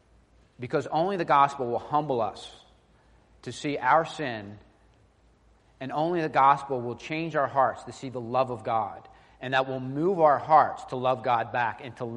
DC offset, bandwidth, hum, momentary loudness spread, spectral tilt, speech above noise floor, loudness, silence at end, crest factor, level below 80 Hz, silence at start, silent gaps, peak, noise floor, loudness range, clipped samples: under 0.1%; 10.5 kHz; none; 17 LU; -6 dB/octave; 35 dB; -26 LUFS; 0 s; 20 dB; -64 dBFS; 0.6 s; none; -8 dBFS; -61 dBFS; 5 LU; under 0.1%